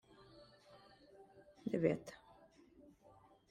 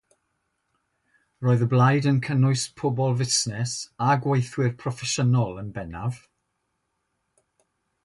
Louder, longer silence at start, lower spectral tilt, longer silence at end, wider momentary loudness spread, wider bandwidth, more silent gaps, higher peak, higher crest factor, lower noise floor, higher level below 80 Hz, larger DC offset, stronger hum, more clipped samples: second, -40 LUFS vs -24 LUFS; second, 0.35 s vs 1.4 s; first, -7.5 dB/octave vs -5 dB/octave; second, 1.35 s vs 1.85 s; first, 28 LU vs 12 LU; first, 13 kHz vs 11.5 kHz; neither; second, -20 dBFS vs -8 dBFS; first, 26 dB vs 18 dB; second, -67 dBFS vs -76 dBFS; second, -76 dBFS vs -56 dBFS; neither; neither; neither